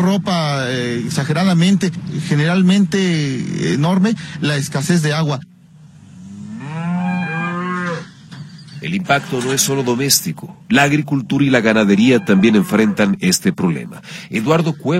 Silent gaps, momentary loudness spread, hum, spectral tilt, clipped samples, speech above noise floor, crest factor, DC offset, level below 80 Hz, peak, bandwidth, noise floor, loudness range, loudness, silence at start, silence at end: none; 15 LU; none; -5 dB/octave; under 0.1%; 27 dB; 16 dB; under 0.1%; -56 dBFS; 0 dBFS; 16.5 kHz; -43 dBFS; 8 LU; -16 LUFS; 0 s; 0 s